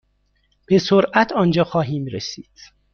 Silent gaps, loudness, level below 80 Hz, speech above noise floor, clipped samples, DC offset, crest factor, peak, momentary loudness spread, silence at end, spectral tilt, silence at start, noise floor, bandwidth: none; -18 LUFS; -54 dBFS; 45 dB; under 0.1%; under 0.1%; 18 dB; -2 dBFS; 13 LU; 0.55 s; -6 dB/octave; 0.7 s; -64 dBFS; 6.8 kHz